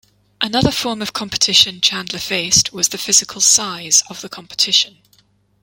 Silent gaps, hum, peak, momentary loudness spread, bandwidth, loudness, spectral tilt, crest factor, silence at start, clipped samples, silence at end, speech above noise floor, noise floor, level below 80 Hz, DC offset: none; none; 0 dBFS; 12 LU; 17 kHz; -14 LUFS; -1 dB/octave; 18 dB; 0.4 s; under 0.1%; 0.75 s; 39 dB; -56 dBFS; -46 dBFS; under 0.1%